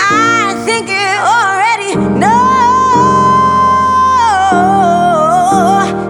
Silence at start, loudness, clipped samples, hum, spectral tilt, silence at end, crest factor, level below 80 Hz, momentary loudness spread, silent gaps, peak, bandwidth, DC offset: 0 s; -9 LUFS; under 0.1%; none; -4.5 dB/octave; 0 s; 10 dB; -40 dBFS; 4 LU; none; 0 dBFS; 12.5 kHz; under 0.1%